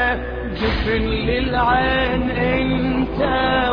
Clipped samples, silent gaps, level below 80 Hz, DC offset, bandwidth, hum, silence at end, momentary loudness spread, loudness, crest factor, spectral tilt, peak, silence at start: under 0.1%; none; -28 dBFS; under 0.1%; 5.2 kHz; none; 0 s; 5 LU; -19 LUFS; 14 dB; -8 dB/octave; -4 dBFS; 0 s